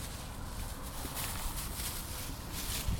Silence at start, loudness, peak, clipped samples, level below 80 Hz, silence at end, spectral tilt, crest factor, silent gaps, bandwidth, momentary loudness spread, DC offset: 0 s; -39 LUFS; -22 dBFS; under 0.1%; -42 dBFS; 0 s; -3 dB/octave; 18 dB; none; 19 kHz; 6 LU; under 0.1%